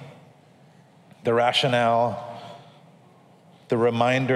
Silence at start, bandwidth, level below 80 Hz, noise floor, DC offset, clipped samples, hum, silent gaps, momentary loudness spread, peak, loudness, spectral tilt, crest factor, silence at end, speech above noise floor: 0 s; 13 kHz; -74 dBFS; -54 dBFS; under 0.1%; under 0.1%; none; none; 18 LU; -6 dBFS; -22 LUFS; -5.5 dB/octave; 20 dB; 0 s; 33 dB